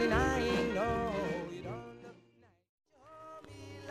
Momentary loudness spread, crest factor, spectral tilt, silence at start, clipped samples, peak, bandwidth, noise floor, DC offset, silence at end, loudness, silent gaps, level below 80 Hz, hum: 21 LU; 20 dB; -5.5 dB/octave; 0 s; under 0.1%; -16 dBFS; 15.5 kHz; -66 dBFS; under 0.1%; 0 s; -34 LUFS; 2.69-2.78 s; -48 dBFS; none